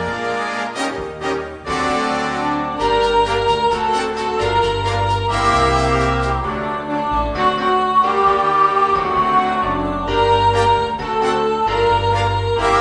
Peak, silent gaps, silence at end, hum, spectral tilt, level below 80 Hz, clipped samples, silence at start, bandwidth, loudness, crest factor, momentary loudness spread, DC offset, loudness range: -4 dBFS; none; 0 s; none; -5 dB/octave; -32 dBFS; under 0.1%; 0 s; 10 kHz; -17 LUFS; 14 dB; 7 LU; under 0.1%; 3 LU